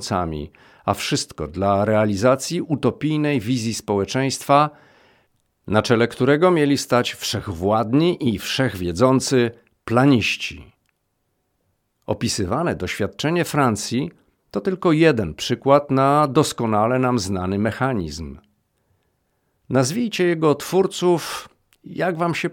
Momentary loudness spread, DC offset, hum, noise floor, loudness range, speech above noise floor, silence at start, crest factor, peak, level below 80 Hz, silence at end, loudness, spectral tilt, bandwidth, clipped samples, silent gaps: 10 LU; under 0.1%; none; -71 dBFS; 5 LU; 52 dB; 0 s; 18 dB; -2 dBFS; -50 dBFS; 0 s; -20 LUFS; -5.5 dB/octave; 18.5 kHz; under 0.1%; none